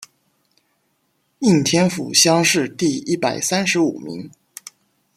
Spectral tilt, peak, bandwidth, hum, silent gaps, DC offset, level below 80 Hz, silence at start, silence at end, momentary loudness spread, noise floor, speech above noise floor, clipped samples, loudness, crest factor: -3.5 dB/octave; -2 dBFS; 15.5 kHz; none; none; under 0.1%; -62 dBFS; 1.4 s; 0.9 s; 22 LU; -67 dBFS; 49 dB; under 0.1%; -17 LUFS; 20 dB